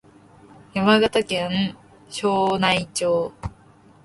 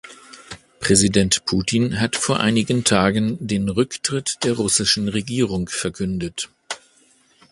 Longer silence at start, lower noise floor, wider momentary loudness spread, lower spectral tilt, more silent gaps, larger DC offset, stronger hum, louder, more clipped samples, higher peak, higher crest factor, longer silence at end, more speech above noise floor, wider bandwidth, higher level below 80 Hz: first, 0.75 s vs 0.05 s; second, -51 dBFS vs -57 dBFS; about the same, 14 LU vs 15 LU; about the same, -4.5 dB/octave vs -4 dB/octave; neither; neither; neither; about the same, -21 LUFS vs -20 LUFS; neither; second, -4 dBFS vs 0 dBFS; about the same, 18 dB vs 20 dB; second, 0.55 s vs 0.75 s; second, 31 dB vs 37 dB; about the same, 11.5 kHz vs 11.5 kHz; second, -50 dBFS vs -44 dBFS